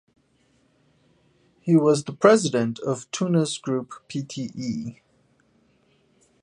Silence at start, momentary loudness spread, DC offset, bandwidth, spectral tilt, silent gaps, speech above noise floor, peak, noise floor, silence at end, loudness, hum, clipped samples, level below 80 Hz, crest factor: 1.65 s; 15 LU; under 0.1%; 11 kHz; -5.5 dB/octave; none; 42 dB; -2 dBFS; -64 dBFS; 1.5 s; -23 LUFS; none; under 0.1%; -68 dBFS; 24 dB